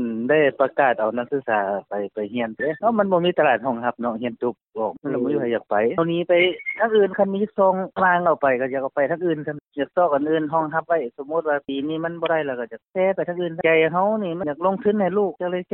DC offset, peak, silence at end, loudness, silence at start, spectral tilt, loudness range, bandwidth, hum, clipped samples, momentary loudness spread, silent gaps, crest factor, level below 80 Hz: under 0.1%; -4 dBFS; 0.1 s; -22 LUFS; 0 s; -10.5 dB/octave; 3 LU; 4.1 kHz; none; under 0.1%; 9 LU; none; 16 dB; -66 dBFS